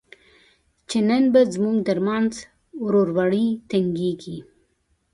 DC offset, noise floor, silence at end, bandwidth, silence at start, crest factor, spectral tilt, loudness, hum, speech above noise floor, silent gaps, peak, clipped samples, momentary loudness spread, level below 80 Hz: under 0.1%; -68 dBFS; 0.7 s; 11.5 kHz; 0.9 s; 16 dB; -6.5 dB/octave; -21 LUFS; none; 47 dB; none; -6 dBFS; under 0.1%; 17 LU; -60 dBFS